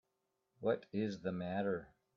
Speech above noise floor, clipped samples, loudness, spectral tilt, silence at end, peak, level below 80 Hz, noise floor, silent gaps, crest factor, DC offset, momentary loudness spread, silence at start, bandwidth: 47 dB; under 0.1%; -40 LUFS; -6.5 dB/octave; 0.3 s; -24 dBFS; -76 dBFS; -85 dBFS; none; 18 dB; under 0.1%; 4 LU; 0.6 s; 7.2 kHz